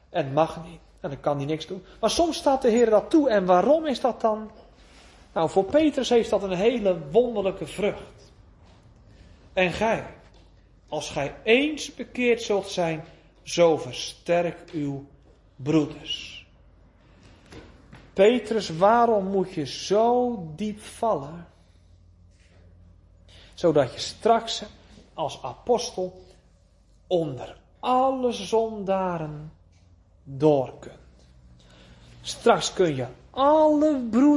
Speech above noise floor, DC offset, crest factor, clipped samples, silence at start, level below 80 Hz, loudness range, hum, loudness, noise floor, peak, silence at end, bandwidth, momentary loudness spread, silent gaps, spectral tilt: 34 dB; under 0.1%; 20 dB; under 0.1%; 0.1 s; -54 dBFS; 7 LU; none; -24 LUFS; -58 dBFS; -4 dBFS; 0 s; 11.5 kHz; 15 LU; none; -5 dB/octave